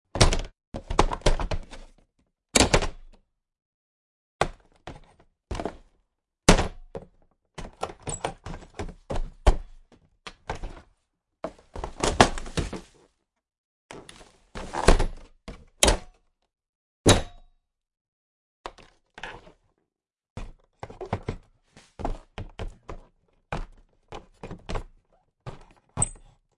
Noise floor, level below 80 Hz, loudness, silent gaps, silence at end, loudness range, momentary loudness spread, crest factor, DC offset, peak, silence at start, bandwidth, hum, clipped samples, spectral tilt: -82 dBFS; -34 dBFS; -27 LUFS; 0.67-0.72 s, 3.65-4.39 s, 13.58-13.89 s, 16.69-17.04 s, 18.01-18.64 s, 20.30-20.36 s; 0.4 s; 14 LU; 25 LU; 28 dB; under 0.1%; 0 dBFS; 0.15 s; 11.5 kHz; none; under 0.1%; -3.5 dB/octave